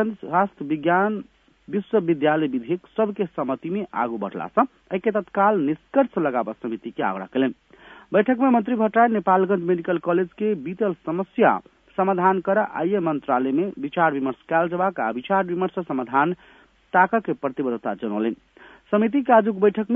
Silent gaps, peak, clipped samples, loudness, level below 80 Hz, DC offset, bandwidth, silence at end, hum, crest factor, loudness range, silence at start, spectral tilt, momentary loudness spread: none; -2 dBFS; under 0.1%; -22 LUFS; -66 dBFS; under 0.1%; 3.8 kHz; 0 s; none; 20 dB; 3 LU; 0 s; -9.5 dB/octave; 9 LU